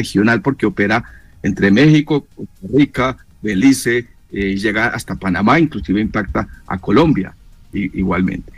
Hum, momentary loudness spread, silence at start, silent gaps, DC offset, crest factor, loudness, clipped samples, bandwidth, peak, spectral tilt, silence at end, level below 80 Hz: none; 11 LU; 0 s; none; 0.3%; 12 dB; -16 LUFS; under 0.1%; 15.5 kHz; -4 dBFS; -6 dB/octave; 0.05 s; -38 dBFS